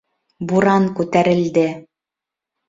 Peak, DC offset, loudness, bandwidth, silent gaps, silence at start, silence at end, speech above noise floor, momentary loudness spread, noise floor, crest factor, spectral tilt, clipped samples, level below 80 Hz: -2 dBFS; under 0.1%; -17 LUFS; 7.8 kHz; none; 0.4 s; 0.9 s; 70 dB; 11 LU; -86 dBFS; 16 dB; -7 dB/octave; under 0.1%; -56 dBFS